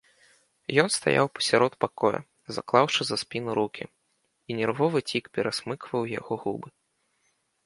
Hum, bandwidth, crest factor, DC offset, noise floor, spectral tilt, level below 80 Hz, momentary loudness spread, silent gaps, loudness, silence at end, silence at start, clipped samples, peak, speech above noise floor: none; 11.5 kHz; 24 dB; under 0.1%; -73 dBFS; -4 dB/octave; -68 dBFS; 13 LU; none; -26 LUFS; 0.95 s; 0.7 s; under 0.1%; -4 dBFS; 47 dB